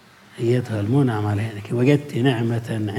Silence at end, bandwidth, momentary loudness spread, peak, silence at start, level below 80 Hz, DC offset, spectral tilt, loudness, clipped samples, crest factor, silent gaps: 0 s; 14 kHz; 7 LU; -4 dBFS; 0.35 s; -66 dBFS; under 0.1%; -7.5 dB/octave; -21 LUFS; under 0.1%; 16 dB; none